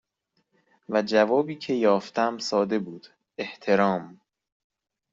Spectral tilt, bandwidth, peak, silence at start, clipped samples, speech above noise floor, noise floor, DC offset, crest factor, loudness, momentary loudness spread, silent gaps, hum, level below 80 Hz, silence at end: -5.5 dB/octave; 7.8 kHz; -6 dBFS; 0.9 s; under 0.1%; 50 dB; -75 dBFS; under 0.1%; 20 dB; -25 LUFS; 14 LU; none; none; -72 dBFS; 1 s